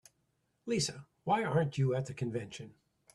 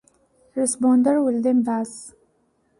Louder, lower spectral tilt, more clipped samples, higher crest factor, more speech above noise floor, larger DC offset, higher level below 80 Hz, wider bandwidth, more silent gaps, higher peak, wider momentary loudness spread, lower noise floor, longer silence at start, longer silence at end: second, -34 LUFS vs -20 LUFS; about the same, -5.5 dB/octave vs -5 dB/octave; neither; about the same, 18 dB vs 14 dB; about the same, 45 dB vs 46 dB; neither; about the same, -68 dBFS vs -66 dBFS; about the same, 12 kHz vs 11.5 kHz; neither; second, -16 dBFS vs -8 dBFS; about the same, 17 LU vs 15 LU; first, -78 dBFS vs -65 dBFS; about the same, 0.65 s vs 0.55 s; second, 0.45 s vs 0.7 s